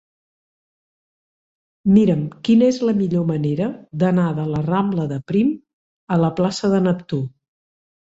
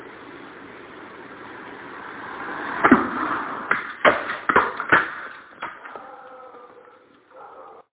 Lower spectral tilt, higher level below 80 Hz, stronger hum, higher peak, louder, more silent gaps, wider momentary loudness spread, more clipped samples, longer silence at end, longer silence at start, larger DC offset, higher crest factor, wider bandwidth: first, -8 dB/octave vs -2.5 dB/octave; about the same, -54 dBFS vs -56 dBFS; neither; second, -4 dBFS vs 0 dBFS; about the same, -19 LUFS vs -21 LUFS; first, 5.73-6.07 s vs none; second, 9 LU vs 23 LU; neither; first, 0.9 s vs 0.1 s; first, 1.85 s vs 0 s; neither; second, 16 dB vs 26 dB; first, 8 kHz vs 4 kHz